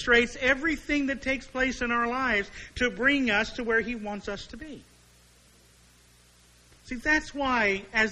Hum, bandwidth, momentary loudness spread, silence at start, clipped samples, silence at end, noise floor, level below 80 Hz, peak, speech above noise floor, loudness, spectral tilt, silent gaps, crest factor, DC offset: 60 Hz at -60 dBFS; 12.5 kHz; 14 LU; 0 s; under 0.1%; 0 s; -58 dBFS; -48 dBFS; -8 dBFS; 31 dB; -26 LUFS; -3.5 dB/octave; none; 20 dB; under 0.1%